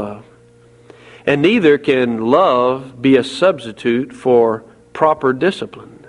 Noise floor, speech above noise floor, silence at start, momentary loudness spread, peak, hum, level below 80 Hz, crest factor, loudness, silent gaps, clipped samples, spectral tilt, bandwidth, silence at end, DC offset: -47 dBFS; 32 dB; 0 s; 12 LU; 0 dBFS; none; -56 dBFS; 16 dB; -15 LUFS; none; under 0.1%; -6.5 dB/octave; 11 kHz; 0.25 s; under 0.1%